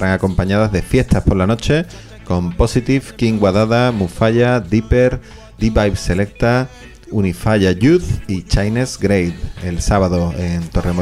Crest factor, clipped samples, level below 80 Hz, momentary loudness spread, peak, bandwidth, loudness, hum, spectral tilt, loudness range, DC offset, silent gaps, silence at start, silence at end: 14 dB; under 0.1%; -26 dBFS; 8 LU; -2 dBFS; 14 kHz; -16 LUFS; none; -6.5 dB/octave; 2 LU; under 0.1%; none; 0 s; 0 s